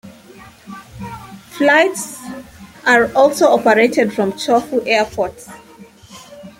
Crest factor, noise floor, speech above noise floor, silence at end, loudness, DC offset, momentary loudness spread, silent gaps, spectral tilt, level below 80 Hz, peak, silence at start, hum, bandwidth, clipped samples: 16 dB; -42 dBFS; 28 dB; 0.1 s; -14 LUFS; under 0.1%; 23 LU; none; -4 dB/octave; -52 dBFS; -2 dBFS; 0.05 s; none; 16.5 kHz; under 0.1%